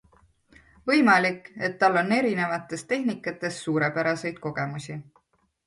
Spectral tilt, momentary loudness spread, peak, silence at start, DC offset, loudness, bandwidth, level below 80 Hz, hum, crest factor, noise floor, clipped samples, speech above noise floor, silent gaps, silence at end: -5.5 dB/octave; 12 LU; -6 dBFS; 0.85 s; under 0.1%; -25 LUFS; 11.5 kHz; -66 dBFS; none; 20 dB; -67 dBFS; under 0.1%; 43 dB; none; 0.65 s